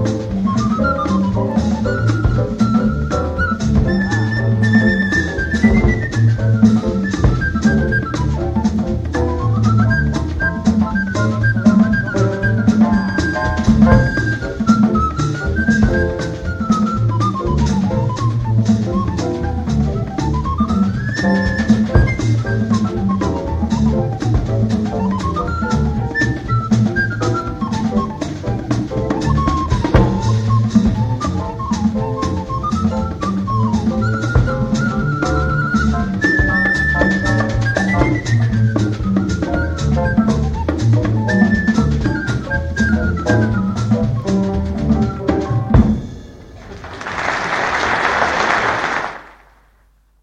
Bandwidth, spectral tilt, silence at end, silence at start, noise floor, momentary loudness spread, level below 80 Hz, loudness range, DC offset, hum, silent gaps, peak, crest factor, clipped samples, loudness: 8.6 kHz; -7 dB/octave; 0.95 s; 0 s; -53 dBFS; 6 LU; -26 dBFS; 3 LU; under 0.1%; none; none; 0 dBFS; 16 dB; under 0.1%; -16 LUFS